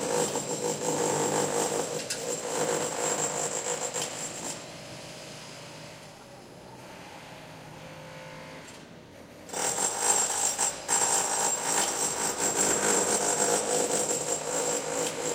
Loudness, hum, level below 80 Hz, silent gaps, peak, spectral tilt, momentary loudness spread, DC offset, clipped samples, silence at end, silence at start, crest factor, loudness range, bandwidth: -27 LUFS; none; -64 dBFS; none; -10 dBFS; -1.5 dB/octave; 21 LU; under 0.1%; under 0.1%; 0 s; 0 s; 20 dB; 19 LU; 16 kHz